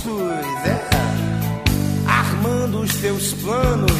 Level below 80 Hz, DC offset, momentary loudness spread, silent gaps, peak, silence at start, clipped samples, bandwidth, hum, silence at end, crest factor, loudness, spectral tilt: -32 dBFS; under 0.1%; 5 LU; none; -2 dBFS; 0 s; under 0.1%; 15.5 kHz; none; 0 s; 18 dB; -20 LUFS; -5 dB/octave